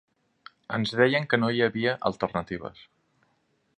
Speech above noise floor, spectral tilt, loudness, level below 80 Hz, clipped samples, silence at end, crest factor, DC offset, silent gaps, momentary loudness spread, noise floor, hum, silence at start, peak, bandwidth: 45 dB; -6.5 dB/octave; -26 LUFS; -60 dBFS; under 0.1%; 1.05 s; 22 dB; under 0.1%; none; 13 LU; -71 dBFS; none; 0.7 s; -6 dBFS; 10 kHz